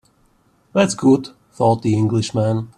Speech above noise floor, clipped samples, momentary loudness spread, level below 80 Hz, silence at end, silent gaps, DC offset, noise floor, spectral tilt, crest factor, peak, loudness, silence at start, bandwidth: 41 dB; under 0.1%; 5 LU; -54 dBFS; 0.1 s; none; under 0.1%; -58 dBFS; -6.5 dB/octave; 18 dB; -2 dBFS; -18 LUFS; 0.75 s; 11.5 kHz